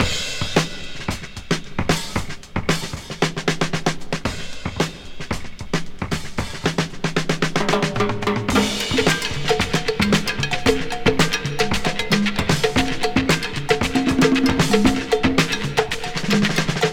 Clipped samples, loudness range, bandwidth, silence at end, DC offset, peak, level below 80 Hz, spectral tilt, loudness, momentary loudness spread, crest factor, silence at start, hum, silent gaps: under 0.1%; 6 LU; 17 kHz; 0 s; under 0.1%; -2 dBFS; -36 dBFS; -4.5 dB/octave; -21 LUFS; 10 LU; 18 dB; 0 s; none; none